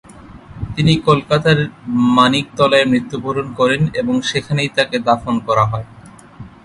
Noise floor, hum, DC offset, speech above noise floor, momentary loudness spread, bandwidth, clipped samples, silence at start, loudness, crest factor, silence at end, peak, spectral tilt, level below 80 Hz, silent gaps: -38 dBFS; none; under 0.1%; 23 dB; 9 LU; 11.5 kHz; under 0.1%; 0.1 s; -15 LUFS; 16 dB; 0.15 s; 0 dBFS; -6 dB/octave; -42 dBFS; none